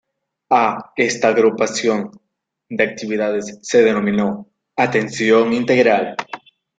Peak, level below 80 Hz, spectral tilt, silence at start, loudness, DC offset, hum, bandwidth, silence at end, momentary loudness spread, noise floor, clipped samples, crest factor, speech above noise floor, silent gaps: -2 dBFS; -60 dBFS; -4.5 dB/octave; 0.5 s; -17 LUFS; under 0.1%; none; 9.2 kHz; 0.4 s; 14 LU; -57 dBFS; under 0.1%; 16 dB; 40 dB; none